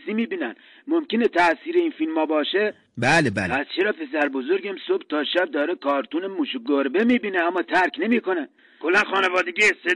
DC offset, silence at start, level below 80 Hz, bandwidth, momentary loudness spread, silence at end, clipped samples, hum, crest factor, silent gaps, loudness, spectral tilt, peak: under 0.1%; 0.05 s; -62 dBFS; 11.5 kHz; 8 LU; 0 s; under 0.1%; none; 14 dB; none; -22 LUFS; -4.5 dB/octave; -8 dBFS